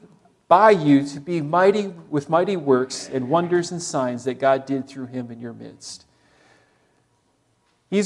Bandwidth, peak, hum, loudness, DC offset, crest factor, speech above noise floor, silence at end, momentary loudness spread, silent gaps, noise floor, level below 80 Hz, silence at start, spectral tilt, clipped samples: 11.5 kHz; -2 dBFS; none; -20 LUFS; under 0.1%; 20 dB; 45 dB; 0 s; 21 LU; none; -65 dBFS; -70 dBFS; 0.5 s; -5.5 dB/octave; under 0.1%